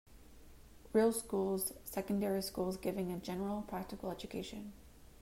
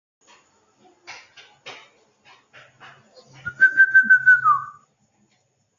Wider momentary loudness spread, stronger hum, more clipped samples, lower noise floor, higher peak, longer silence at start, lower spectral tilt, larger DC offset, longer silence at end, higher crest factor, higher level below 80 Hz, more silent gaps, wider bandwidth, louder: second, 11 LU vs 28 LU; neither; neither; second, -57 dBFS vs -67 dBFS; second, -20 dBFS vs -6 dBFS; second, 0.1 s vs 1.1 s; first, -5 dB/octave vs -2.5 dB/octave; neither; second, 0.05 s vs 1.1 s; about the same, 18 dB vs 18 dB; first, -60 dBFS vs -70 dBFS; neither; first, 16 kHz vs 7.4 kHz; second, -38 LUFS vs -15 LUFS